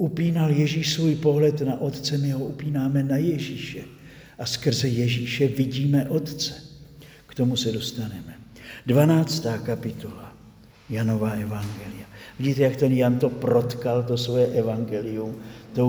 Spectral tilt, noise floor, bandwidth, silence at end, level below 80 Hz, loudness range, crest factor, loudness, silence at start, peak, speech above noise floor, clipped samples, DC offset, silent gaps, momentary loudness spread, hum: -6.5 dB/octave; -50 dBFS; over 20 kHz; 0 s; -56 dBFS; 4 LU; 18 dB; -24 LUFS; 0 s; -6 dBFS; 26 dB; under 0.1%; under 0.1%; none; 17 LU; none